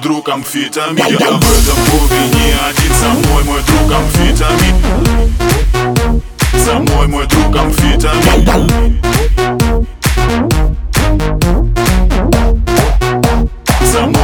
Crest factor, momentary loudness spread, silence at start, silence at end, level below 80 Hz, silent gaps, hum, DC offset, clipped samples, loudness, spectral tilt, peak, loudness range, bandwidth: 10 dB; 5 LU; 0 s; 0 s; -14 dBFS; none; none; 0.4%; 0.1%; -11 LUFS; -4.5 dB/octave; 0 dBFS; 2 LU; 19.5 kHz